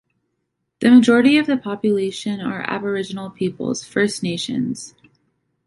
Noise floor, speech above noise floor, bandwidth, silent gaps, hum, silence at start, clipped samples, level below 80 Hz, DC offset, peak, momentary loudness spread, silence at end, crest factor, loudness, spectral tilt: -74 dBFS; 56 dB; 11.5 kHz; none; none; 0.8 s; under 0.1%; -62 dBFS; under 0.1%; -2 dBFS; 13 LU; 0.8 s; 18 dB; -19 LUFS; -5 dB/octave